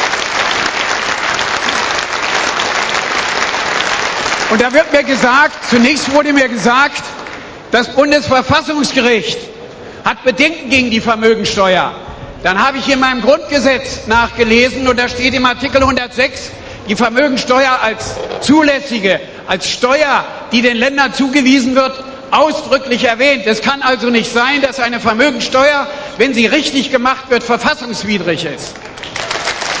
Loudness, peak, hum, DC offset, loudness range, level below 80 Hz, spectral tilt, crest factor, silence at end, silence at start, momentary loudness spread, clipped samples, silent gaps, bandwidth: -12 LUFS; 0 dBFS; none; under 0.1%; 2 LU; -40 dBFS; -3.5 dB/octave; 12 dB; 0 s; 0 s; 9 LU; 0.2%; none; 8 kHz